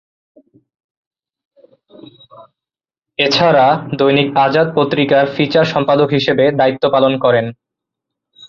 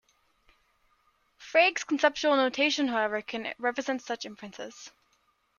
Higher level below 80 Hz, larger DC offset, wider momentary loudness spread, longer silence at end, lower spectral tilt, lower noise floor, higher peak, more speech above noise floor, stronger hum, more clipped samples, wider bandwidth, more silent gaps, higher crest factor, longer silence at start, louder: first, -56 dBFS vs -72 dBFS; neither; second, 4 LU vs 18 LU; second, 0 s vs 0.7 s; first, -6.5 dB/octave vs -2 dB/octave; first, -85 dBFS vs -71 dBFS; first, 0 dBFS vs -8 dBFS; first, 72 dB vs 43 dB; neither; neither; about the same, 7.2 kHz vs 7.4 kHz; neither; second, 14 dB vs 22 dB; first, 2.4 s vs 1.4 s; first, -13 LUFS vs -27 LUFS